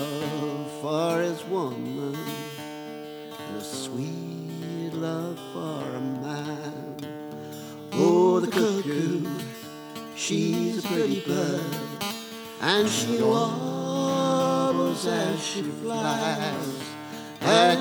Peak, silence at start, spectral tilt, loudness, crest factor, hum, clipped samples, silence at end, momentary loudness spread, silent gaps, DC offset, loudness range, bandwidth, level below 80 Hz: -4 dBFS; 0 s; -4.5 dB/octave; -27 LUFS; 22 dB; none; under 0.1%; 0 s; 15 LU; none; under 0.1%; 8 LU; over 20 kHz; -74 dBFS